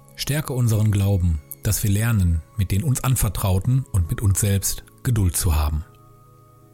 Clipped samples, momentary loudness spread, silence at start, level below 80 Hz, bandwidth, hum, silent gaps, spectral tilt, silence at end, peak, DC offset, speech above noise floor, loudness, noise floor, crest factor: under 0.1%; 5 LU; 0.15 s; -32 dBFS; 17 kHz; none; none; -5 dB/octave; 0.9 s; -10 dBFS; under 0.1%; 30 dB; -22 LUFS; -50 dBFS; 12 dB